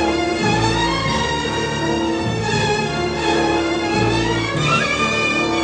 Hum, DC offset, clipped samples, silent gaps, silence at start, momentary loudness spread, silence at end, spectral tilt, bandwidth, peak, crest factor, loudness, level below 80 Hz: none; under 0.1%; under 0.1%; none; 0 s; 4 LU; 0 s; -4.5 dB/octave; 9.8 kHz; -4 dBFS; 14 dB; -18 LUFS; -36 dBFS